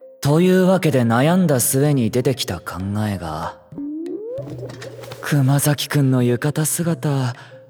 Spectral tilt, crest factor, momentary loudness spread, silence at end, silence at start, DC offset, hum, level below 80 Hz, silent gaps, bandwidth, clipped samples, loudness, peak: -5.5 dB/octave; 16 dB; 15 LU; 0.1 s; 0 s; under 0.1%; none; -52 dBFS; none; over 20 kHz; under 0.1%; -18 LUFS; -2 dBFS